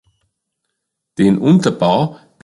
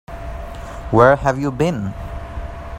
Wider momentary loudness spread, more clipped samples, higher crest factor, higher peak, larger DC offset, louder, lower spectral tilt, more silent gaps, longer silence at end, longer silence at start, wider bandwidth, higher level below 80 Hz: second, 10 LU vs 19 LU; neither; about the same, 16 dB vs 20 dB; about the same, -2 dBFS vs 0 dBFS; neither; first, -14 LUFS vs -17 LUFS; about the same, -7 dB/octave vs -7 dB/octave; neither; first, 0.3 s vs 0 s; first, 1.2 s vs 0.1 s; second, 11.5 kHz vs 15.5 kHz; second, -52 dBFS vs -32 dBFS